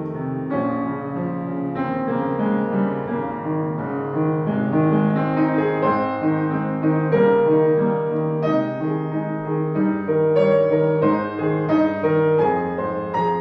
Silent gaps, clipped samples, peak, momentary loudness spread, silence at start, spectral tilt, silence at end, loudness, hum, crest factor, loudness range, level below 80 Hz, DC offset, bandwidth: none; under 0.1%; -6 dBFS; 8 LU; 0 s; -10.5 dB/octave; 0 s; -21 LUFS; none; 14 dB; 5 LU; -58 dBFS; under 0.1%; 5.6 kHz